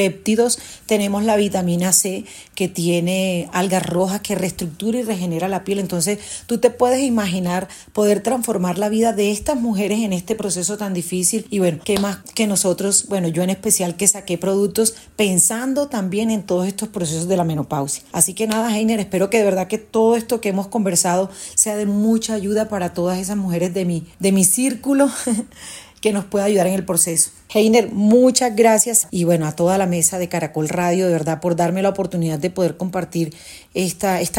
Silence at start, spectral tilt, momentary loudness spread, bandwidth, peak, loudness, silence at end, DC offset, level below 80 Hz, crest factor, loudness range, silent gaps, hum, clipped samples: 0 s; -4 dB/octave; 8 LU; 16.5 kHz; 0 dBFS; -18 LUFS; 0 s; under 0.1%; -54 dBFS; 18 dB; 5 LU; none; none; under 0.1%